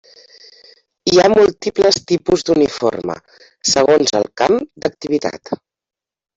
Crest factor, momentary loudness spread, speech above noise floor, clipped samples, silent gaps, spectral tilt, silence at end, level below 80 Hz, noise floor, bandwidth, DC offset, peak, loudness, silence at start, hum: 14 dB; 14 LU; 73 dB; under 0.1%; none; -3.5 dB/octave; 0.8 s; -50 dBFS; -88 dBFS; 7.8 kHz; under 0.1%; -2 dBFS; -15 LUFS; 1.05 s; none